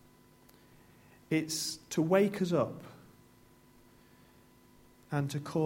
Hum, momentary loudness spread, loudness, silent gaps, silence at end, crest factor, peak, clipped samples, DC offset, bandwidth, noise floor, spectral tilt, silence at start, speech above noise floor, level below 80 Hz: 50 Hz at -60 dBFS; 10 LU; -32 LUFS; none; 0 s; 22 dB; -12 dBFS; under 0.1%; under 0.1%; 16.5 kHz; -61 dBFS; -5 dB/octave; 1.3 s; 30 dB; -70 dBFS